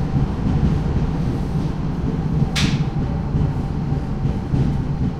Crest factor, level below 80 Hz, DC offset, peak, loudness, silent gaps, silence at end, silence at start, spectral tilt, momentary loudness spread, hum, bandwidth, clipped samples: 14 dB; -26 dBFS; under 0.1%; -6 dBFS; -21 LUFS; none; 0 s; 0 s; -7 dB/octave; 4 LU; none; 11.5 kHz; under 0.1%